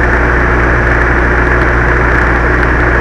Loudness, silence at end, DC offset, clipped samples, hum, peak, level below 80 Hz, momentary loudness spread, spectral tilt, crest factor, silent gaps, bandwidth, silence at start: -10 LUFS; 0 s; under 0.1%; 0.4%; none; 0 dBFS; -14 dBFS; 0 LU; -7.5 dB/octave; 8 dB; none; 7.6 kHz; 0 s